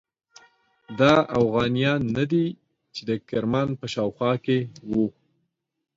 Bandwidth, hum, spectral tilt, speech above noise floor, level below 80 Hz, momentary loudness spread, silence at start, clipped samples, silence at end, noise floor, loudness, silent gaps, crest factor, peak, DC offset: 7.8 kHz; none; -7 dB/octave; 53 dB; -56 dBFS; 11 LU; 0.9 s; under 0.1%; 0.85 s; -76 dBFS; -24 LUFS; none; 20 dB; -4 dBFS; under 0.1%